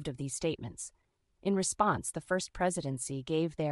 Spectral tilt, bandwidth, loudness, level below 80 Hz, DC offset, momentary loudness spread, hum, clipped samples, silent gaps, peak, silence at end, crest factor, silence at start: -4.5 dB/octave; 13 kHz; -33 LUFS; -58 dBFS; under 0.1%; 10 LU; none; under 0.1%; none; -12 dBFS; 0 s; 22 dB; 0 s